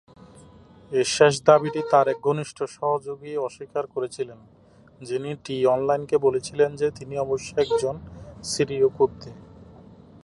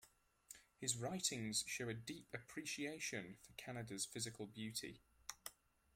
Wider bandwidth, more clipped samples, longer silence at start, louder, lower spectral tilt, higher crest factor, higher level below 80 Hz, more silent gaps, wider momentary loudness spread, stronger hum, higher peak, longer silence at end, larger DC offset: second, 11.5 kHz vs 16.5 kHz; neither; first, 0.9 s vs 0 s; first, -24 LUFS vs -46 LUFS; first, -4.5 dB/octave vs -2.5 dB/octave; about the same, 22 dB vs 24 dB; first, -56 dBFS vs -78 dBFS; neither; about the same, 14 LU vs 14 LU; neither; first, -2 dBFS vs -24 dBFS; first, 0.6 s vs 0.45 s; neither